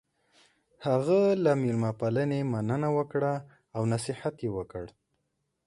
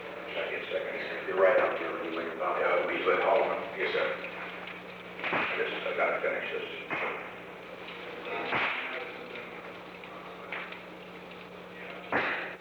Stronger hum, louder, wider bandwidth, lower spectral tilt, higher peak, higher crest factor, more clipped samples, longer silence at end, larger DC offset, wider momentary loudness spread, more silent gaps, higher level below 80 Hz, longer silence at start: second, none vs 60 Hz at -55 dBFS; about the same, -29 LUFS vs -31 LUFS; second, 11.5 kHz vs over 20 kHz; first, -7.5 dB/octave vs -5.5 dB/octave; about the same, -12 dBFS vs -12 dBFS; about the same, 16 dB vs 20 dB; neither; first, 0.8 s vs 0 s; neither; second, 13 LU vs 17 LU; neither; first, -62 dBFS vs -70 dBFS; first, 0.8 s vs 0 s